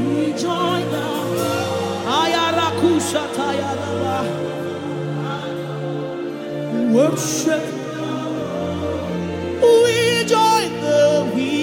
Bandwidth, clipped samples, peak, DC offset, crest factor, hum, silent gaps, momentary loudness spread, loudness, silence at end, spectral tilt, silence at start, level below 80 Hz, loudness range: 17 kHz; under 0.1%; -2 dBFS; under 0.1%; 16 dB; none; none; 11 LU; -19 LUFS; 0 s; -4.5 dB/octave; 0 s; -52 dBFS; 6 LU